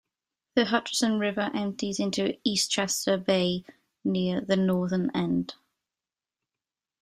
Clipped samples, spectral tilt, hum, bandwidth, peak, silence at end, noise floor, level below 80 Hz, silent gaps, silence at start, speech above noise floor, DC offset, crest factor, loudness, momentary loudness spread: under 0.1%; -4.5 dB/octave; none; 15.5 kHz; -8 dBFS; 1.5 s; under -90 dBFS; -66 dBFS; none; 0.55 s; over 63 dB; under 0.1%; 20 dB; -27 LUFS; 5 LU